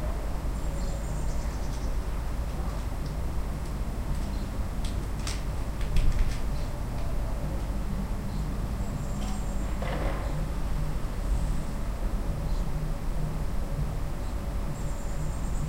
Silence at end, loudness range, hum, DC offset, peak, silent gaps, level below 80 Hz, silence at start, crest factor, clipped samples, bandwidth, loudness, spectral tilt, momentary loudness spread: 0 s; 1 LU; none; under 0.1%; -10 dBFS; none; -30 dBFS; 0 s; 18 dB; under 0.1%; 16 kHz; -34 LUFS; -6 dB/octave; 3 LU